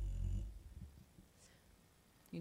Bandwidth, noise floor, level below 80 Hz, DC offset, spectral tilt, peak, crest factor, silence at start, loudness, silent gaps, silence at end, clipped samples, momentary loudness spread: 15 kHz; -69 dBFS; -48 dBFS; under 0.1%; -7 dB/octave; -30 dBFS; 16 dB; 0 s; -49 LUFS; none; 0 s; under 0.1%; 24 LU